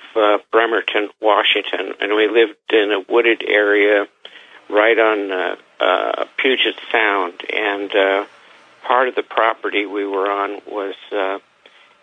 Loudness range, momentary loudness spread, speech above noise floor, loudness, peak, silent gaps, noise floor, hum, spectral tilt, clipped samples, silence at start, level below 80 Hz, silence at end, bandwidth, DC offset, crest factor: 5 LU; 10 LU; 32 dB; -17 LUFS; -2 dBFS; none; -50 dBFS; none; -3.5 dB/octave; under 0.1%; 0 s; -78 dBFS; 0.65 s; 6.8 kHz; under 0.1%; 16 dB